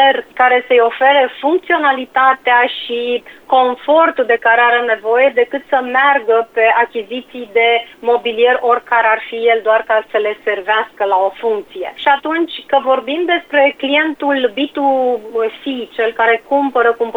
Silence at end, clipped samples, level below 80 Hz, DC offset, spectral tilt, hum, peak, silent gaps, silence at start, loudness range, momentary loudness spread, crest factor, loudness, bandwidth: 0 s; under 0.1%; -60 dBFS; under 0.1%; -4 dB/octave; none; 0 dBFS; none; 0 s; 3 LU; 7 LU; 12 dB; -14 LUFS; 4.5 kHz